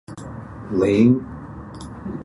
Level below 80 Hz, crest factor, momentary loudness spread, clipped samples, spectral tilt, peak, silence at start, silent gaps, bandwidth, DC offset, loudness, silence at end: -44 dBFS; 18 dB; 20 LU; under 0.1%; -8 dB/octave; -4 dBFS; 0.1 s; none; 11 kHz; under 0.1%; -18 LUFS; 0 s